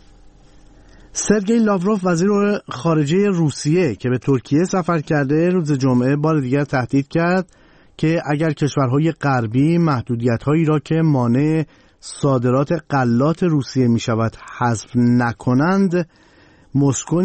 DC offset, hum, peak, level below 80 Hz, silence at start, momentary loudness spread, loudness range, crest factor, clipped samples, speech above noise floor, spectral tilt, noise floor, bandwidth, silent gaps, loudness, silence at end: under 0.1%; none; -2 dBFS; -50 dBFS; 1.15 s; 5 LU; 1 LU; 14 dB; under 0.1%; 33 dB; -6.5 dB/octave; -50 dBFS; 8.8 kHz; none; -18 LUFS; 0 s